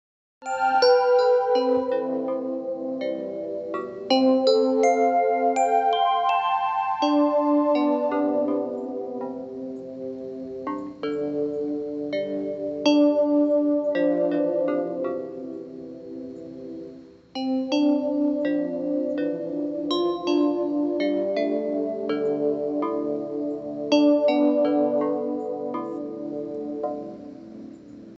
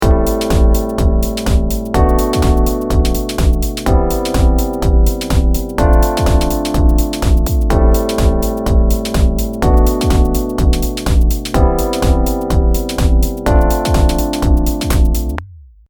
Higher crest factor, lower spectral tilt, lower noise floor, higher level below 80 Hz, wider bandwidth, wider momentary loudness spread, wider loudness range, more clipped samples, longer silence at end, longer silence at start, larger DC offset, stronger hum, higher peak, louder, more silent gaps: about the same, 16 dB vs 12 dB; about the same, -5 dB/octave vs -6 dB/octave; first, -44 dBFS vs -35 dBFS; second, -68 dBFS vs -14 dBFS; second, 8 kHz vs over 20 kHz; first, 15 LU vs 3 LU; first, 8 LU vs 1 LU; neither; second, 0.05 s vs 0.3 s; first, 0.4 s vs 0 s; neither; neither; second, -8 dBFS vs 0 dBFS; second, -24 LUFS vs -15 LUFS; neither